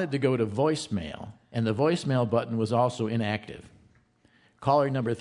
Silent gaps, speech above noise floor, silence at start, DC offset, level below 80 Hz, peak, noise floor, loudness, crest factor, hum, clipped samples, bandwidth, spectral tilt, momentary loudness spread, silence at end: none; 36 dB; 0 s; under 0.1%; -62 dBFS; -10 dBFS; -63 dBFS; -27 LUFS; 18 dB; none; under 0.1%; 11 kHz; -6.5 dB/octave; 11 LU; 0 s